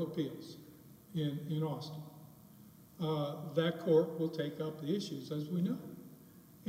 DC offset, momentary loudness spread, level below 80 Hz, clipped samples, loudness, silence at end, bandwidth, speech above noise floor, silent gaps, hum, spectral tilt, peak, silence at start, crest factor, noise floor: under 0.1%; 26 LU; -78 dBFS; under 0.1%; -37 LUFS; 0 s; 16 kHz; 22 dB; none; none; -7.5 dB/octave; -18 dBFS; 0 s; 20 dB; -58 dBFS